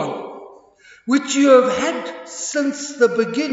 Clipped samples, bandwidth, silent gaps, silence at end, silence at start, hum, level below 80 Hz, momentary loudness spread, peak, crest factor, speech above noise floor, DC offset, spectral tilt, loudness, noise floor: under 0.1%; 8 kHz; none; 0 s; 0 s; none; -64 dBFS; 18 LU; -2 dBFS; 18 dB; 31 dB; under 0.1%; -3.5 dB/octave; -18 LUFS; -48 dBFS